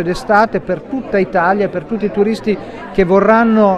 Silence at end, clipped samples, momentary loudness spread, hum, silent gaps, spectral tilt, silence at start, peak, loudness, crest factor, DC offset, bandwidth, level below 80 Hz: 0 s; under 0.1%; 11 LU; none; none; -7 dB/octave; 0 s; 0 dBFS; -14 LUFS; 14 dB; under 0.1%; 11.5 kHz; -40 dBFS